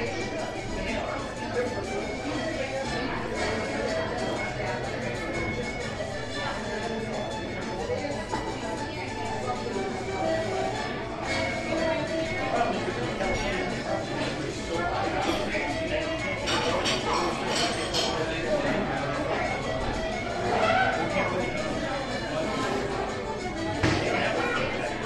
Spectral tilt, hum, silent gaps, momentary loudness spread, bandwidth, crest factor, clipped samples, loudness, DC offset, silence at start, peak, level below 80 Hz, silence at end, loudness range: -4.5 dB/octave; none; none; 6 LU; 12 kHz; 18 dB; under 0.1%; -29 LUFS; under 0.1%; 0 s; -10 dBFS; -44 dBFS; 0 s; 5 LU